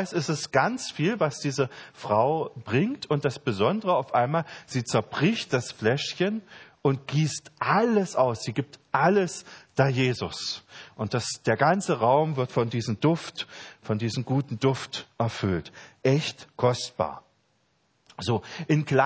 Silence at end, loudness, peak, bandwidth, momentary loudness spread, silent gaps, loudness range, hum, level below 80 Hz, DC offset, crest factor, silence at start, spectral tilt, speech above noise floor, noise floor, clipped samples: 0 s; -26 LUFS; -6 dBFS; 8 kHz; 10 LU; none; 3 LU; none; -58 dBFS; under 0.1%; 20 dB; 0 s; -5.5 dB/octave; 43 dB; -69 dBFS; under 0.1%